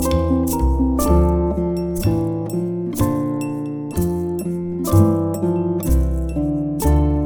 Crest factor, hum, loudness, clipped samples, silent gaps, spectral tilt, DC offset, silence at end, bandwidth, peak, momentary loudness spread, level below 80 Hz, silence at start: 16 dB; none; -20 LUFS; under 0.1%; none; -7.5 dB/octave; under 0.1%; 0 s; over 20 kHz; -2 dBFS; 7 LU; -24 dBFS; 0 s